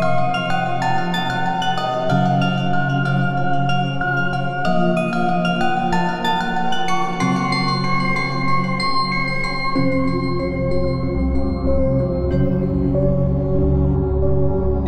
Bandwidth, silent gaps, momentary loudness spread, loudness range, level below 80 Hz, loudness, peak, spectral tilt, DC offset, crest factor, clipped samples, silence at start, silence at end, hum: 11 kHz; none; 3 LU; 1 LU; -30 dBFS; -19 LUFS; -6 dBFS; -7 dB/octave; under 0.1%; 12 dB; under 0.1%; 0 s; 0 s; none